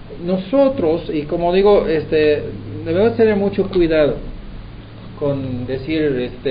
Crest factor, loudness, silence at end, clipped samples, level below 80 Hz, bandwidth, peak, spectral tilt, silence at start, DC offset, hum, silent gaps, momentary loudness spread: 14 dB; -17 LUFS; 0 s; under 0.1%; -36 dBFS; 5.2 kHz; -2 dBFS; -10.5 dB/octave; 0 s; under 0.1%; none; none; 20 LU